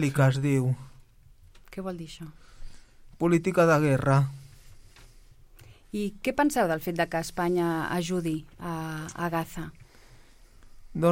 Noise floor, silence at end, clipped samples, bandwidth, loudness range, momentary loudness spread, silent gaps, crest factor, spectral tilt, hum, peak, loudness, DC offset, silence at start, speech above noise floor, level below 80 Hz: -54 dBFS; 0 s; under 0.1%; 16.5 kHz; 5 LU; 17 LU; none; 18 dB; -6.5 dB/octave; none; -10 dBFS; -27 LUFS; under 0.1%; 0 s; 28 dB; -50 dBFS